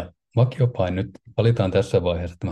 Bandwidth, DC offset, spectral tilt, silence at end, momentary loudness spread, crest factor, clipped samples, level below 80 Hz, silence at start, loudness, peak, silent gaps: 9.2 kHz; under 0.1%; -8 dB/octave; 0 s; 8 LU; 16 dB; under 0.1%; -50 dBFS; 0 s; -22 LUFS; -6 dBFS; none